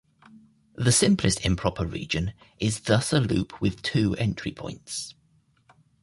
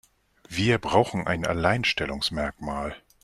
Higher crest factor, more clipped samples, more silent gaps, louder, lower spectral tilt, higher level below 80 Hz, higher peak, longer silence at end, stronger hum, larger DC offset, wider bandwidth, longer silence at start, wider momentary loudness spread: about the same, 20 dB vs 22 dB; neither; neither; about the same, -25 LUFS vs -25 LUFS; about the same, -4.5 dB/octave vs -5 dB/octave; about the same, -44 dBFS vs -46 dBFS; about the same, -6 dBFS vs -4 dBFS; first, 0.9 s vs 0.25 s; neither; neither; second, 11.5 kHz vs 13.5 kHz; second, 0.35 s vs 0.5 s; first, 13 LU vs 10 LU